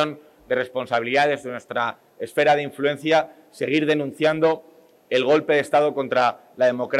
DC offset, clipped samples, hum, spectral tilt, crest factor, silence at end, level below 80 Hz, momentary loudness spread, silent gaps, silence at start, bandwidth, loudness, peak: under 0.1%; under 0.1%; none; -5 dB/octave; 14 dB; 0 s; -70 dBFS; 9 LU; none; 0 s; 13.5 kHz; -22 LUFS; -6 dBFS